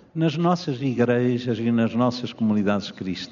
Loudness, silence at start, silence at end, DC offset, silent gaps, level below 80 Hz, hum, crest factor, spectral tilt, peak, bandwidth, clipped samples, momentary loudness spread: -23 LUFS; 0.15 s; 0 s; under 0.1%; none; -64 dBFS; none; 16 dB; -6 dB/octave; -6 dBFS; 7.2 kHz; under 0.1%; 5 LU